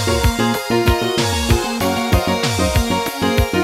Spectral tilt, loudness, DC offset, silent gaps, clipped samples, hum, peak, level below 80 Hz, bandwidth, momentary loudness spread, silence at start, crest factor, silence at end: -4.5 dB/octave; -17 LUFS; under 0.1%; none; under 0.1%; none; 0 dBFS; -26 dBFS; 16.5 kHz; 2 LU; 0 s; 16 dB; 0 s